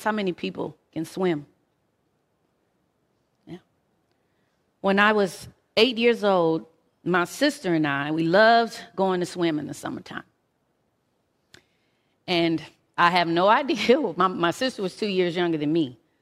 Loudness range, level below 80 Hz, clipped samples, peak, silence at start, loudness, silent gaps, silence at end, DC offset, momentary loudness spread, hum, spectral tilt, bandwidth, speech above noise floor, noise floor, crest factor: 11 LU; -68 dBFS; under 0.1%; -2 dBFS; 0 s; -23 LUFS; none; 0.25 s; under 0.1%; 15 LU; none; -5 dB/octave; 15 kHz; 49 dB; -71 dBFS; 22 dB